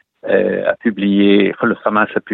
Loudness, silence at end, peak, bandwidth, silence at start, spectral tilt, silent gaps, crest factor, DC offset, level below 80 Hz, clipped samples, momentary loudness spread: -15 LUFS; 0 s; 0 dBFS; 4.2 kHz; 0.25 s; -9.5 dB/octave; none; 14 dB; under 0.1%; -58 dBFS; under 0.1%; 6 LU